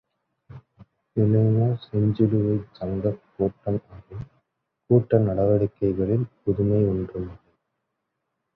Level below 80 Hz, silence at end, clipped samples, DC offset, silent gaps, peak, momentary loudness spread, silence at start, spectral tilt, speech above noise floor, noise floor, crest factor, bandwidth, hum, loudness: -48 dBFS; 1.2 s; under 0.1%; under 0.1%; none; -4 dBFS; 15 LU; 0.5 s; -12.5 dB/octave; 57 dB; -79 dBFS; 20 dB; 4.5 kHz; none; -23 LUFS